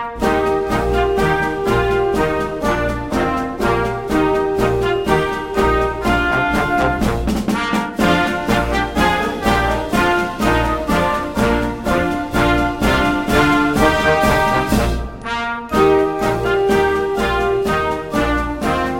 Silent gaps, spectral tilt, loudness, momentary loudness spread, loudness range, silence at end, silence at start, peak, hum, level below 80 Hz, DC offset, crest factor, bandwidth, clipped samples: none; -5.5 dB/octave; -17 LUFS; 5 LU; 2 LU; 0 s; 0 s; 0 dBFS; none; -28 dBFS; under 0.1%; 16 dB; 16.5 kHz; under 0.1%